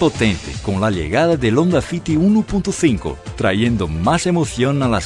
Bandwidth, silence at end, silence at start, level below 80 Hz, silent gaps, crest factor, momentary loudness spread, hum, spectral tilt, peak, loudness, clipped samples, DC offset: 11 kHz; 0 s; 0 s; -34 dBFS; none; 16 dB; 6 LU; none; -6 dB/octave; -2 dBFS; -17 LUFS; under 0.1%; under 0.1%